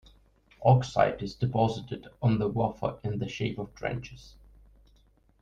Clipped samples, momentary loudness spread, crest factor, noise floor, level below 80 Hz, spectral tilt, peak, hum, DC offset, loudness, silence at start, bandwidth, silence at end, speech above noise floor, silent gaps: under 0.1%; 12 LU; 22 dB; -63 dBFS; -54 dBFS; -7.5 dB/octave; -8 dBFS; none; under 0.1%; -29 LUFS; 0.6 s; 7.8 kHz; 1.1 s; 35 dB; none